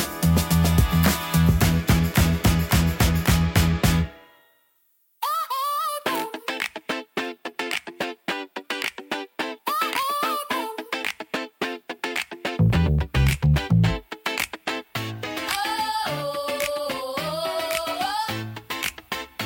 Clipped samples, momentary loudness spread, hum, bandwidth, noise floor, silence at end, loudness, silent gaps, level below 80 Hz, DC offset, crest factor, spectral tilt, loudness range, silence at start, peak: under 0.1%; 11 LU; none; 17 kHz; -65 dBFS; 0 s; -24 LUFS; none; -34 dBFS; under 0.1%; 18 dB; -5 dB/octave; 8 LU; 0 s; -6 dBFS